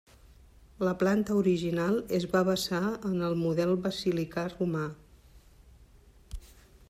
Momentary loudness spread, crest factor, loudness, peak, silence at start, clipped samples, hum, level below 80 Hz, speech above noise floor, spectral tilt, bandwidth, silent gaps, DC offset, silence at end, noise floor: 9 LU; 16 dB; -29 LUFS; -14 dBFS; 0.8 s; under 0.1%; none; -54 dBFS; 28 dB; -6 dB/octave; 15.5 kHz; none; under 0.1%; 0.45 s; -57 dBFS